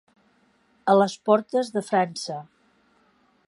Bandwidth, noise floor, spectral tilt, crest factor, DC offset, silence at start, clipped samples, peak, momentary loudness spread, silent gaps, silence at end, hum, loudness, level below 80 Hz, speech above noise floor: 11.5 kHz; -63 dBFS; -5.5 dB/octave; 20 dB; under 0.1%; 0.85 s; under 0.1%; -4 dBFS; 13 LU; none; 1.05 s; none; -23 LUFS; -78 dBFS; 41 dB